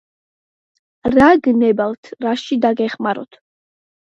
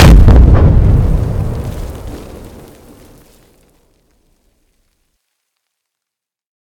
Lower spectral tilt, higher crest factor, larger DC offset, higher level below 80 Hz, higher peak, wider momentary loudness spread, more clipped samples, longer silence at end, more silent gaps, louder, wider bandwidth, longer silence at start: about the same, -6.5 dB/octave vs -7 dB/octave; first, 18 dB vs 12 dB; neither; second, -50 dBFS vs -14 dBFS; about the same, 0 dBFS vs 0 dBFS; second, 13 LU vs 25 LU; second, under 0.1% vs 3%; second, 0.8 s vs 4.45 s; first, 1.98-2.03 s vs none; second, -16 LUFS vs -10 LUFS; second, 7.8 kHz vs 14.5 kHz; first, 1.05 s vs 0 s